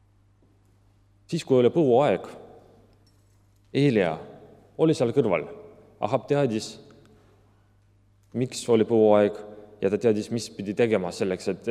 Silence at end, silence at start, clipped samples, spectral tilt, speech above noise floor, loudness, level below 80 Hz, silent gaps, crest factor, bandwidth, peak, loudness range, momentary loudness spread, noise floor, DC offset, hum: 0 s; 1.3 s; under 0.1%; -6.5 dB/octave; 37 dB; -24 LUFS; -66 dBFS; none; 20 dB; 13 kHz; -6 dBFS; 4 LU; 18 LU; -60 dBFS; under 0.1%; none